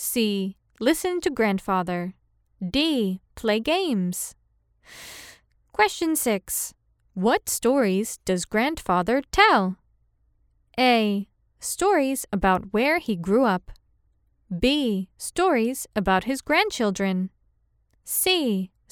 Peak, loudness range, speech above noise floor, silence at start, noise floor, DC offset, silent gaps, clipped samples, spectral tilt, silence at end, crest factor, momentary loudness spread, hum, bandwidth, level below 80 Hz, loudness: -2 dBFS; 4 LU; 43 dB; 0 s; -66 dBFS; under 0.1%; none; under 0.1%; -4 dB/octave; 0.25 s; 22 dB; 13 LU; none; 18 kHz; -48 dBFS; -23 LUFS